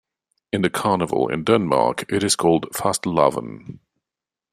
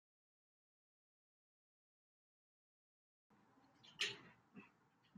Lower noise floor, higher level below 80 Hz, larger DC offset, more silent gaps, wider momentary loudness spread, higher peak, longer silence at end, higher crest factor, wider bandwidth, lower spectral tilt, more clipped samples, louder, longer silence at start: first, -88 dBFS vs -75 dBFS; first, -56 dBFS vs under -90 dBFS; neither; neither; second, 9 LU vs 20 LU; first, -2 dBFS vs -28 dBFS; first, 0.8 s vs 0.5 s; second, 20 dB vs 30 dB; first, 14.5 kHz vs 7.4 kHz; first, -4.5 dB/octave vs 0.5 dB/octave; neither; first, -20 LUFS vs -45 LUFS; second, 0.55 s vs 3.3 s